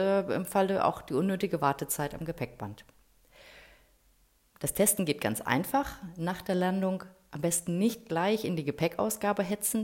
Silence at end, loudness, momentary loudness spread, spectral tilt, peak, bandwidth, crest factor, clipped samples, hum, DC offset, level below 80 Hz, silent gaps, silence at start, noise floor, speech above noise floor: 0 s; -30 LUFS; 10 LU; -4.5 dB/octave; -10 dBFS; 16.5 kHz; 22 dB; under 0.1%; none; under 0.1%; -58 dBFS; none; 0 s; -66 dBFS; 36 dB